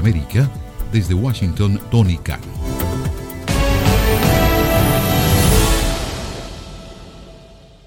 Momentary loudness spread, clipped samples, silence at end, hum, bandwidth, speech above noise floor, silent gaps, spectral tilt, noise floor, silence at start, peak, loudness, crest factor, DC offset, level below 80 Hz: 16 LU; under 0.1%; 0.3 s; none; 17 kHz; 25 dB; none; -5.5 dB/octave; -42 dBFS; 0 s; 0 dBFS; -17 LUFS; 16 dB; under 0.1%; -24 dBFS